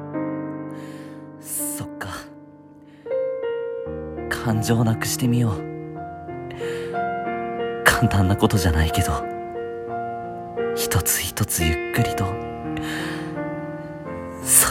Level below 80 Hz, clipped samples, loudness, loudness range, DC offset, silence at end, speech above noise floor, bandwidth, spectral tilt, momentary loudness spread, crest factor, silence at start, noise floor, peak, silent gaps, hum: -38 dBFS; under 0.1%; -24 LUFS; 8 LU; under 0.1%; 0 s; 26 dB; 16.5 kHz; -4 dB/octave; 15 LU; 24 dB; 0 s; -46 dBFS; 0 dBFS; none; none